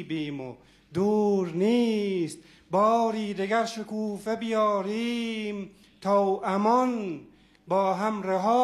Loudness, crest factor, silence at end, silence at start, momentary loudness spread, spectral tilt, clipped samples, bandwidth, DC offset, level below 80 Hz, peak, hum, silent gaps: -27 LUFS; 16 dB; 0 s; 0 s; 12 LU; -6 dB/octave; under 0.1%; 12.5 kHz; under 0.1%; -66 dBFS; -10 dBFS; none; none